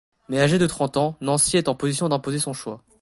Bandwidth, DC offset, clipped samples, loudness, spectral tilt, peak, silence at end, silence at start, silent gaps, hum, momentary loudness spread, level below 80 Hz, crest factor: 12 kHz; under 0.1%; under 0.1%; -22 LUFS; -4.5 dB/octave; -6 dBFS; 0.25 s; 0.3 s; none; none; 9 LU; -52 dBFS; 18 dB